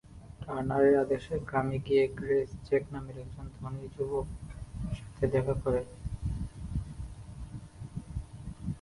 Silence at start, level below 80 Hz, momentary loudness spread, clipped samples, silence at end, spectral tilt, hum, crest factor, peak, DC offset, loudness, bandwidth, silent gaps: 0.05 s; -46 dBFS; 17 LU; under 0.1%; 0 s; -8 dB/octave; none; 20 dB; -14 dBFS; under 0.1%; -32 LUFS; 11.5 kHz; none